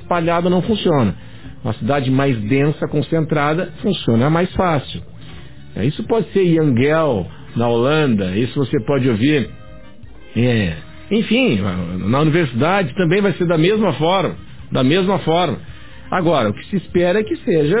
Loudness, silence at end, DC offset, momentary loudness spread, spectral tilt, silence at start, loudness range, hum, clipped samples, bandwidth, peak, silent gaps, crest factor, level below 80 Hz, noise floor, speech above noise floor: -17 LUFS; 0 s; 2%; 9 LU; -11 dB/octave; 0 s; 2 LU; none; under 0.1%; 4 kHz; -4 dBFS; none; 14 dB; -42 dBFS; -40 dBFS; 24 dB